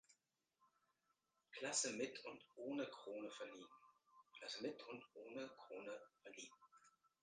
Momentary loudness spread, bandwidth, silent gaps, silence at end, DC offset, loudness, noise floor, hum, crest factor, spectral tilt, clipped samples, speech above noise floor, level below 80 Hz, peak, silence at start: 17 LU; 9.6 kHz; none; 0.35 s; under 0.1%; -50 LUFS; -87 dBFS; none; 24 dB; -1.5 dB/octave; under 0.1%; 36 dB; under -90 dBFS; -28 dBFS; 0.1 s